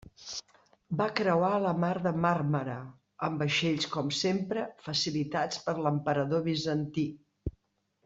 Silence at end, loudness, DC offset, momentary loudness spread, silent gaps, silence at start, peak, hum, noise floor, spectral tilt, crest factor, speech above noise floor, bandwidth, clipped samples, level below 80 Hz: 0.55 s; -30 LUFS; under 0.1%; 13 LU; none; 0.2 s; -12 dBFS; none; -76 dBFS; -5.5 dB/octave; 20 dB; 46 dB; 8 kHz; under 0.1%; -58 dBFS